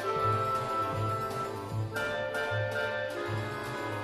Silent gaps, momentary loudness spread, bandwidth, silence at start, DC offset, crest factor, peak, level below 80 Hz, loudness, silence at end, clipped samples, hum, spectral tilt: none; 7 LU; 14 kHz; 0 s; under 0.1%; 14 dB; -18 dBFS; -58 dBFS; -32 LUFS; 0 s; under 0.1%; none; -5.5 dB/octave